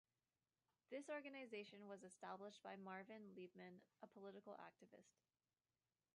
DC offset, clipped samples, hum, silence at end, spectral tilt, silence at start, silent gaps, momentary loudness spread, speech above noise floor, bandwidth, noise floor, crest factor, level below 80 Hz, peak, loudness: under 0.1%; under 0.1%; none; 1.05 s; -5 dB/octave; 0.9 s; none; 10 LU; over 32 dB; 10 kHz; under -90 dBFS; 18 dB; under -90 dBFS; -42 dBFS; -58 LUFS